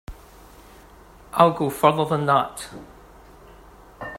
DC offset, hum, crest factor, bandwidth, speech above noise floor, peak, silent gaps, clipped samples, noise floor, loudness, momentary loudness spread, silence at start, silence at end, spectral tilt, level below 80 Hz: under 0.1%; none; 24 dB; 16 kHz; 27 dB; 0 dBFS; none; under 0.1%; -48 dBFS; -20 LUFS; 20 LU; 0.1 s; 0 s; -6 dB/octave; -50 dBFS